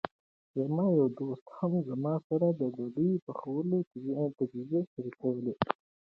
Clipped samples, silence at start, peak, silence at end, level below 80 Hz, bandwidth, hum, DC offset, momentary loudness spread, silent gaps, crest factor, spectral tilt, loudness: under 0.1%; 0.05 s; -10 dBFS; 0.4 s; -70 dBFS; 5.2 kHz; none; under 0.1%; 9 LU; 0.11-0.54 s, 1.41-1.46 s, 2.24-2.30 s, 3.22-3.27 s, 3.87-3.91 s, 4.87-4.96 s; 22 dB; -11 dB/octave; -33 LUFS